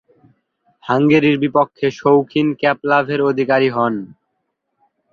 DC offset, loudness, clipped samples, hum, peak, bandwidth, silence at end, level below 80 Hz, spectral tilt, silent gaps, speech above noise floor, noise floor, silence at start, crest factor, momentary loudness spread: under 0.1%; -16 LUFS; under 0.1%; none; -2 dBFS; 6.8 kHz; 1 s; -60 dBFS; -7.5 dB/octave; none; 57 dB; -72 dBFS; 0.85 s; 16 dB; 7 LU